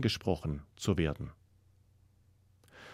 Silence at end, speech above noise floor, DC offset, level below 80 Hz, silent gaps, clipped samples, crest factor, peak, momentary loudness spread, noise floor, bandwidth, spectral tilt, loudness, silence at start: 0 s; 33 dB; under 0.1%; -54 dBFS; none; under 0.1%; 22 dB; -14 dBFS; 14 LU; -66 dBFS; 15.5 kHz; -6 dB/octave; -35 LUFS; 0 s